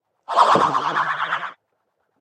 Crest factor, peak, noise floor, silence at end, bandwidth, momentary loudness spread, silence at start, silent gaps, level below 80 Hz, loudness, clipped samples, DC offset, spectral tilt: 20 dB; -2 dBFS; -72 dBFS; 0.7 s; 10 kHz; 11 LU; 0.3 s; none; -66 dBFS; -19 LUFS; under 0.1%; under 0.1%; -3.5 dB/octave